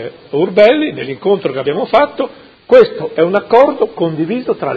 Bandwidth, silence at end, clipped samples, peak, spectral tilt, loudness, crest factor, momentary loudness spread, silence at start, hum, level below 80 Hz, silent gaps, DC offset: 6.4 kHz; 0 s; 0.5%; 0 dBFS; -7.5 dB/octave; -13 LUFS; 12 dB; 10 LU; 0 s; none; -54 dBFS; none; under 0.1%